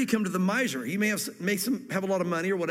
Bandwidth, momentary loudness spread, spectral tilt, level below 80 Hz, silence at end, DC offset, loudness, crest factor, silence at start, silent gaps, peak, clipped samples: 16.5 kHz; 3 LU; -4.5 dB/octave; -72 dBFS; 0 s; under 0.1%; -28 LUFS; 16 dB; 0 s; none; -12 dBFS; under 0.1%